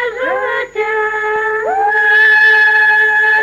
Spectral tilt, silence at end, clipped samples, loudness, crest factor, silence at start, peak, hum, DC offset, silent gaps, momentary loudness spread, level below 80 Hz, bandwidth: -2 dB/octave; 0 s; under 0.1%; -10 LUFS; 10 dB; 0 s; -2 dBFS; none; under 0.1%; none; 10 LU; -52 dBFS; 13.5 kHz